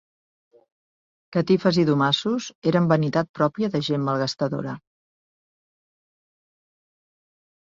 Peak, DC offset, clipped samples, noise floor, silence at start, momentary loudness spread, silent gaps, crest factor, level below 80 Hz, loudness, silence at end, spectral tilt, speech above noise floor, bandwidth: -6 dBFS; under 0.1%; under 0.1%; under -90 dBFS; 1.3 s; 8 LU; 2.55-2.62 s, 3.29-3.34 s; 20 dB; -64 dBFS; -22 LUFS; 3 s; -6.5 dB/octave; over 68 dB; 7.6 kHz